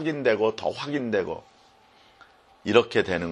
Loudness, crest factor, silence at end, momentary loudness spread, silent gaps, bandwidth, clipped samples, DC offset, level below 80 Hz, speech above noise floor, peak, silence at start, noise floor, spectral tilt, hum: -25 LUFS; 22 dB; 0 s; 13 LU; none; 10 kHz; under 0.1%; under 0.1%; -60 dBFS; 32 dB; -4 dBFS; 0 s; -57 dBFS; -5.5 dB/octave; none